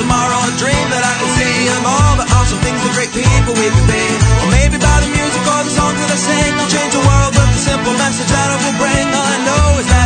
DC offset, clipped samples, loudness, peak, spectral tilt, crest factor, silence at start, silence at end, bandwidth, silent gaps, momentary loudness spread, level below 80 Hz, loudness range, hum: under 0.1%; under 0.1%; -12 LUFS; 0 dBFS; -4 dB/octave; 12 dB; 0 s; 0 s; 9.4 kHz; none; 3 LU; -20 dBFS; 0 LU; none